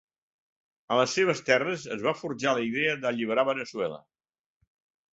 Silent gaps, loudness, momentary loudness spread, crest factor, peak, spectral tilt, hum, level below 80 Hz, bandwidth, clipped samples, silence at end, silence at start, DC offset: none; -27 LUFS; 8 LU; 22 dB; -8 dBFS; -4 dB/octave; none; -70 dBFS; 8 kHz; under 0.1%; 1.15 s; 0.9 s; under 0.1%